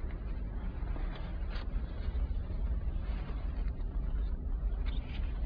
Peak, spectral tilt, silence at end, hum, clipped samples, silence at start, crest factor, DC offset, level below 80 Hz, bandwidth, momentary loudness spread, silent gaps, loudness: -24 dBFS; -9.5 dB/octave; 0 s; none; under 0.1%; 0 s; 12 dB; under 0.1%; -34 dBFS; 5 kHz; 4 LU; none; -39 LUFS